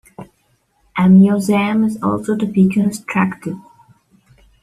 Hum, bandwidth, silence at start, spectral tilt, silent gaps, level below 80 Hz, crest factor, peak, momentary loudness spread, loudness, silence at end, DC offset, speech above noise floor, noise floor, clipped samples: none; 13 kHz; 0.2 s; -7.5 dB/octave; none; -52 dBFS; 14 dB; -2 dBFS; 17 LU; -15 LUFS; 1 s; under 0.1%; 47 dB; -61 dBFS; under 0.1%